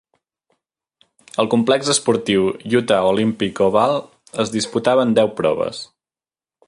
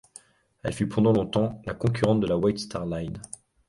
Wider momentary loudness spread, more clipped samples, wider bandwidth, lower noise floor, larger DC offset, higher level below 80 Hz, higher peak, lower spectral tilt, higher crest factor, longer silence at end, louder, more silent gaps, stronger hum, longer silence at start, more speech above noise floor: second, 9 LU vs 13 LU; neither; about the same, 11.5 kHz vs 11.5 kHz; first, under -90 dBFS vs -53 dBFS; neither; second, -56 dBFS vs -50 dBFS; first, -2 dBFS vs -8 dBFS; second, -4.5 dB/octave vs -7 dB/octave; about the same, 18 dB vs 18 dB; first, 0.85 s vs 0.4 s; first, -18 LUFS vs -26 LUFS; neither; neither; first, 1.4 s vs 0.65 s; first, over 73 dB vs 28 dB